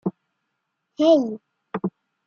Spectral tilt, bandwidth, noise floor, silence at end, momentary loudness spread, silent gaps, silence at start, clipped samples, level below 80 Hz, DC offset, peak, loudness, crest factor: -7 dB/octave; 7 kHz; -77 dBFS; 0.4 s; 16 LU; none; 0.05 s; under 0.1%; -72 dBFS; under 0.1%; -6 dBFS; -22 LUFS; 18 dB